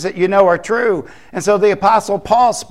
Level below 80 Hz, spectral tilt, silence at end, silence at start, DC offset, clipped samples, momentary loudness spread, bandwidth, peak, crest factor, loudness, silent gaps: -48 dBFS; -4.5 dB/octave; 0.05 s; 0 s; 0.7%; under 0.1%; 8 LU; 13.5 kHz; 0 dBFS; 14 dB; -14 LUFS; none